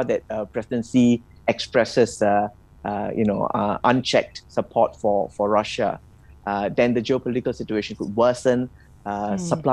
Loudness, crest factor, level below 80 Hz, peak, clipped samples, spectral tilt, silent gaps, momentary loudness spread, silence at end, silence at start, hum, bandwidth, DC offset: -22 LUFS; 20 dB; -52 dBFS; -2 dBFS; under 0.1%; -5.5 dB/octave; none; 9 LU; 0 s; 0 s; none; 11.5 kHz; under 0.1%